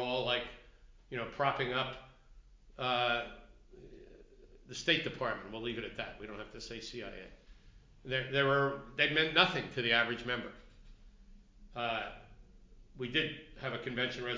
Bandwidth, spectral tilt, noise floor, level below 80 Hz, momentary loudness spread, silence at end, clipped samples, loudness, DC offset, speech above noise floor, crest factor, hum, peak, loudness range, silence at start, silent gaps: 7.6 kHz; -4.5 dB/octave; -59 dBFS; -58 dBFS; 18 LU; 0 s; under 0.1%; -34 LUFS; under 0.1%; 24 dB; 28 dB; none; -10 dBFS; 9 LU; 0 s; none